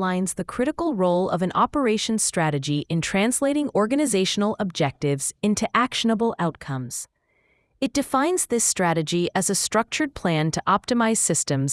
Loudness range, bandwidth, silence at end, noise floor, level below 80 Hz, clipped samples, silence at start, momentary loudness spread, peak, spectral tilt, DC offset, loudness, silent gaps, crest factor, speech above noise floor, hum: 3 LU; 12 kHz; 0 s; -66 dBFS; -54 dBFS; under 0.1%; 0 s; 6 LU; -6 dBFS; -4 dB/octave; under 0.1%; -23 LUFS; none; 18 dB; 43 dB; none